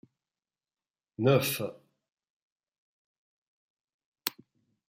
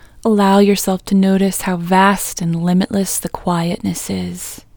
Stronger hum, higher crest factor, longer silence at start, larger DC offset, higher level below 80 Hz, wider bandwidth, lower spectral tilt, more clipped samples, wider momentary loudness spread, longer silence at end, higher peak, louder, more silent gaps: neither; first, 26 dB vs 16 dB; first, 1.2 s vs 0.25 s; neither; second, -76 dBFS vs -44 dBFS; second, 15.5 kHz vs over 20 kHz; about the same, -5 dB/octave vs -5.5 dB/octave; neither; first, 14 LU vs 9 LU; first, 0.6 s vs 0.2 s; second, -8 dBFS vs 0 dBFS; second, -30 LUFS vs -16 LUFS; first, 2.13-2.17 s, 2.30-2.56 s, 2.78-3.77 s, 3.84-3.88 s, 3.94-3.99 s, 4.05-4.12 s vs none